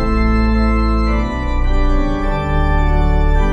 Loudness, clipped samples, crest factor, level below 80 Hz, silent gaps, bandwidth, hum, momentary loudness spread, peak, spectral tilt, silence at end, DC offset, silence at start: -17 LUFS; under 0.1%; 12 dB; -14 dBFS; none; 7.4 kHz; none; 4 LU; -2 dBFS; -8 dB/octave; 0 s; under 0.1%; 0 s